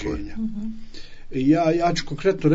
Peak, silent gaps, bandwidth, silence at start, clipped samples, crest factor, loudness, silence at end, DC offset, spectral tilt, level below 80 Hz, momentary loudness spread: -6 dBFS; none; 7.8 kHz; 0 s; under 0.1%; 16 dB; -23 LUFS; 0 s; under 0.1%; -6.5 dB/octave; -40 dBFS; 16 LU